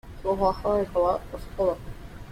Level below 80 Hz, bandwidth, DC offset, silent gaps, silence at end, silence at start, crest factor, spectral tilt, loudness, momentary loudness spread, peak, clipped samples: -42 dBFS; 15.5 kHz; under 0.1%; none; 0 s; 0.05 s; 16 dB; -7.5 dB/octave; -26 LUFS; 15 LU; -10 dBFS; under 0.1%